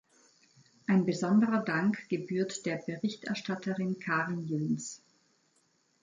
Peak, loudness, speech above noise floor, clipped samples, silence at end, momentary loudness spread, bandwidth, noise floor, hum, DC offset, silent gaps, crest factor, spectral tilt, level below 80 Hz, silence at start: -16 dBFS; -32 LUFS; 41 dB; under 0.1%; 1.05 s; 9 LU; 9.4 kHz; -72 dBFS; none; under 0.1%; none; 16 dB; -6 dB/octave; -76 dBFS; 0.9 s